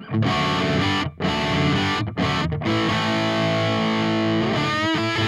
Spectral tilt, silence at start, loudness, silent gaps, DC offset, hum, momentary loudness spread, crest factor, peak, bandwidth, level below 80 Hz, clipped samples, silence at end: -5.5 dB/octave; 0 s; -21 LUFS; none; under 0.1%; none; 3 LU; 12 dB; -10 dBFS; 12.5 kHz; -46 dBFS; under 0.1%; 0 s